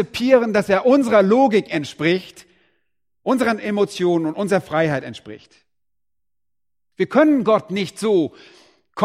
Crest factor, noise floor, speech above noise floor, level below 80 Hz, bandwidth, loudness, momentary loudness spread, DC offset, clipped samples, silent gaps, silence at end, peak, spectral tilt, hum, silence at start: 18 dB; -87 dBFS; 69 dB; -60 dBFS; 15 kHz; -18 LUFS; 11 LU; under 0.1%; under 0.1%; none; 0 s; 0 dBFS; -6 dB/octave; none; 0 s